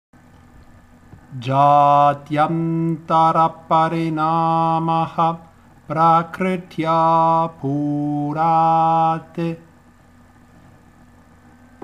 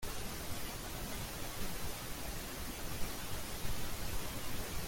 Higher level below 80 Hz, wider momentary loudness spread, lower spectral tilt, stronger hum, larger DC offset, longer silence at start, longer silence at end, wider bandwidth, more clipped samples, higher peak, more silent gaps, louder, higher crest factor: second, -56 dBFS vs -46 dBFS; first, 9 LU vs 1 LU; first, -8 dB/octave vs -3 dB/octave; neither; neither; first, 1.3 s vs 0 s; first, 2.25 s vs 0 s; second, 10.5 kHz vs 17 kHz; neither; first, -4 dBFS vs -22 dBFS; neither; first, -18 LUFS vs -43 LUFS; about the same, 16 dB vs 16 dB